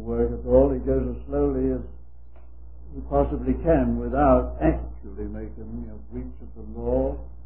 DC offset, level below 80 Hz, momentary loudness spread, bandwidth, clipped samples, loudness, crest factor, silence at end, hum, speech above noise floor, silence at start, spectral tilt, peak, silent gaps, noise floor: 1%; -32 dBFS; 19 LU; 3.2 kHz; under 0.1%; -24 LUFS; 20 dB; 0 s; none; 23 dB; 0 s; -13 dB/octave; -6 dBFS; none; -47 dBFS